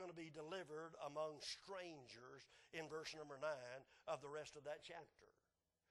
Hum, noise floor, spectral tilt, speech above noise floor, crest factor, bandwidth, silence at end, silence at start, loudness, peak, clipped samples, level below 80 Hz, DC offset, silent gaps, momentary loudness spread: none; under -90 dBFS; -3.5 dB/octave; over 37 dB; 20 dB; 12 kHz; 0.6 s; 0 s; -53 LUFS; -34 dBFS; under 0.1%; -86 dBFS; under 0.1%; none; 11 LU